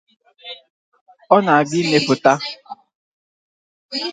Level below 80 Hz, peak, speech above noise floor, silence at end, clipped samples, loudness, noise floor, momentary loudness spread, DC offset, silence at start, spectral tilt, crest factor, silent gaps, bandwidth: -66 dBFS; 0 dBFS; 23 dB; 0 s; under 0.1%; -17 LUFS; -39 dBFS; 24 LU; under 0.1%; 0.45 s; -4.5 dB/octave; 20 dB; 0.70-0.92 s, 1.01-1.06 s, 2.95-3.89 s; 9.4 kHz